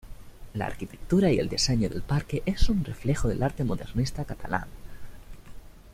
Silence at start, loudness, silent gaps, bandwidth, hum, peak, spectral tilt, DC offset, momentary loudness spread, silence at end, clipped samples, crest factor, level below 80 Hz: 0.05 s; -28 LUFS; none; 15.5 kHz; none; -8 dBFS; -5.5 dB/octave; under 0.1%; 13 LU; 0 s; under 0.1%; 18 dB; -36 dBFS